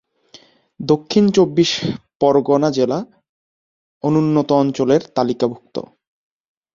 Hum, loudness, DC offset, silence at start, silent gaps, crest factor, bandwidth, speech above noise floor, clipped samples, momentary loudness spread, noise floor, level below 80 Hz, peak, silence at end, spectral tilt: none; -17 LUFS; under 0.1%; 0.8 s; 2.15-2.20 s, 3.29-4.01 s; 16 dB; 7.6 kHz; 32 dB; under 0.1%; 13 LU; -48 dBFS; -56 dBFS; -2 dBFS; 0.9 s; -6 dB/octave